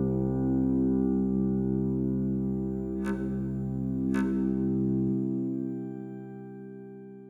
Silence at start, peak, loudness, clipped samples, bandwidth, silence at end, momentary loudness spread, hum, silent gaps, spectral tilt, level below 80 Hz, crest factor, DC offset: 0 s; -16 dBFS; -29 LUFS; under 0.1%; 7.4 kHz; 0 s; 15 LU; none; none; -10.5 dB/octave; -46 dBFS; 12 dB; under 0.1%